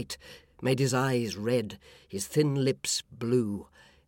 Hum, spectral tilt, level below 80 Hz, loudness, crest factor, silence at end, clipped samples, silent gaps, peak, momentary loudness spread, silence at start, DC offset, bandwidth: none; -5 dB/octave; -64 dBFS; -29 LUFS; 16 dB; 0.45 s; under 0.1%; none; -14 dBFS; 14 LU; 0 s; under 0.1%; 17 kHz